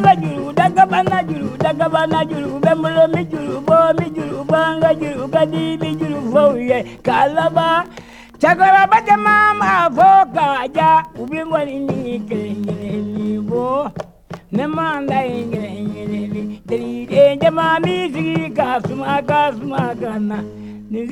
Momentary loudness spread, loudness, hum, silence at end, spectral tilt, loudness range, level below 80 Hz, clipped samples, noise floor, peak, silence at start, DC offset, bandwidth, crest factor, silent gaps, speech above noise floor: 12 LU; -16 LUFS; none; 0 s; -6.5 dB/octave; 9 LU; -50 dBFS; under 0.1%; -38 dBFS; 0 dBFS; 0 s; under 0.1%; 13.5 kHz; 16 dB; none; 22 dB